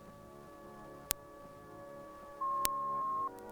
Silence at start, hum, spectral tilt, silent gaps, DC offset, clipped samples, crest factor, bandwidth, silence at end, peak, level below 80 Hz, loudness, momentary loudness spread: 0 s; none; -2 dB/octave; none; under 0.1%; under 0.1%; 40 dB; over 20 kHz; 0 s; 0 dBFS; -64 dBFS; -37 LUFS; 19 LU